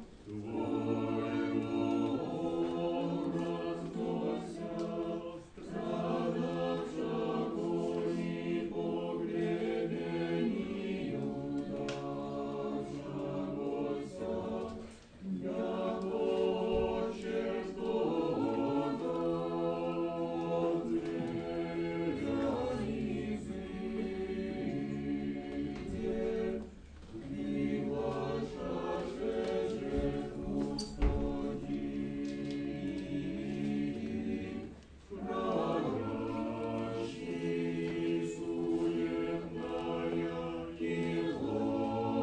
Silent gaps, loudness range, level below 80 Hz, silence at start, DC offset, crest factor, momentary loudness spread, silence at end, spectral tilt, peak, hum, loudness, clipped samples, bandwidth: none; 4 LU; -52 dBFS; 0 s; under 0.1%; 18 dB; 6 LU; 0 s; -7.5 dB/octave; -18 dBFS; none; -36 LUFS; under 0.1%; 9.8 kHz